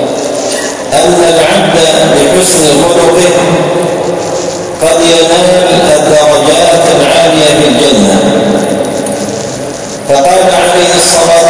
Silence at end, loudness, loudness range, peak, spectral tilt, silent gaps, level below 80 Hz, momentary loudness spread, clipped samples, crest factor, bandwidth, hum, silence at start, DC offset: 0 s; -6 LUFS; 3 LU; 0 dBFS; -3.5 dB/octave; none; -36 dBFS; 8 LU; 3%; 6 dB; 11 kHz; none; 0 s; under 0.1%